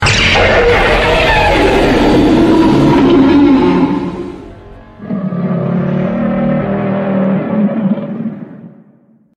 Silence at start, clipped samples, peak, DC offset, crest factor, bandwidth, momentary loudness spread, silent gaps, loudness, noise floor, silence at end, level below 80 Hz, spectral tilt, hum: 0 s; under 0.1%; 0 dBFS; under 0.1%; 12 dB; 13 kHz; 14 LU; none; -11 LUFS; -47 dBFS; 0.7 s; -26 dBFS; -6 dB/octave; none